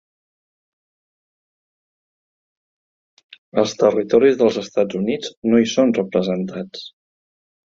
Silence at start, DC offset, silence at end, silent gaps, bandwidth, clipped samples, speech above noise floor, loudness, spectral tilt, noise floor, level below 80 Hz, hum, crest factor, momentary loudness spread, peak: 3.55 s; under 0.1%; 0.75 s; 5.37-5.42 s; 7.6 kHz; under 0.1%; over 72 dB; -18 LUFS; -5.5 dB/octave; under -90 dBFS; -60 dBFS; none; 20 dB; 14 LU; 0 dBFS